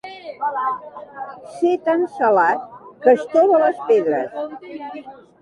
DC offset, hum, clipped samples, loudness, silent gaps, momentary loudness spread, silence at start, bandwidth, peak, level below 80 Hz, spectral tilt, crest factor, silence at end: under 0.1%; none; under 0.1%; -18 LUFS; none; 18 LU; 0.05 s; 11 kHz; -2 dBFS; -70 dBFS; -6 dB/octave; 18 dB; 0.3 s